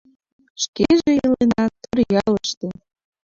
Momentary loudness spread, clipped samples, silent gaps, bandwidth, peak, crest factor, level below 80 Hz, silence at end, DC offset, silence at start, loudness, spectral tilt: 10 LU; under 0.1%; 0.68-0.73 s, 2.57-2.61 s; 7.6 kHz; -4 dBFS; 16 dB; -48 dBFS; 0.55 s; under 0.1%; 0.6 s; -19 LUFS; -5 dB/octave